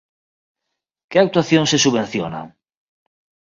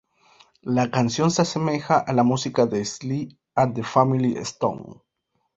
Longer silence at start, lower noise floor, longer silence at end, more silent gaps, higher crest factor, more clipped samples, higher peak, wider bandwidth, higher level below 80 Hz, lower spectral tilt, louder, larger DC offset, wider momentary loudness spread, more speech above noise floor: first, 1.1 s vs 0.65 s; first, -80 dBFS vs -74 dBFS; first, 0.95 s vs 0.65 s; neither; about the same, 20 dB vs 20 dB; neither; about the same, 0 dBFS vs -2 dBFS; about the same, 7.6 kHz vs 7.8 kHz; about the same, -58 dBFS vs -58 dBFS; second, -4 dB/octave vs -5.5 dB/octave; first, -17 LUFS vs -23 LUFS; neither; first, 12 LU vs 8 LU; first, 63 dB vs 52 dB